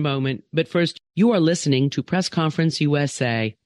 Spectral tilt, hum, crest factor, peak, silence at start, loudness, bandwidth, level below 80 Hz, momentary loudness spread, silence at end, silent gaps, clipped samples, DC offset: -5.5 dB/octave; none; 14 dB; -8 dBFS; 0 s; -21 LUFS; 11.5 kHz; -62 dBFS; 5 LU; 0.15 s; none; under 0.1%; under 0.1%